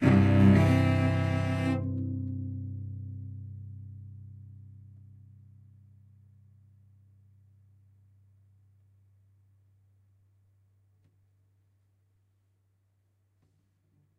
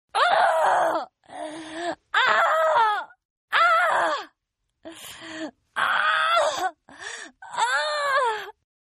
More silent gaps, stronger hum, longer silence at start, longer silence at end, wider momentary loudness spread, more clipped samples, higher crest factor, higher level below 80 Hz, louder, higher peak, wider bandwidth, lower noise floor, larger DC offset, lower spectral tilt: second, none vs 3.25-3.48 s; neither; second, 0 s vs 0.15 s; first, 9.65 s vs 0.4 s; first, 28 LU vs 19 LU; neither; about the same, 24 dB vs 20 dB; first, -56 dBFS vs -74 dBFS; second, -27 LUFS vs -22 LUFS; second, -8 dBFS vs -4 dBFS; second, 9.2 kHz vs 13 kHz; second, -71 dBFS vs -79 dBFS; neither; first, -8.5 dB/octave vs -1 dB/octave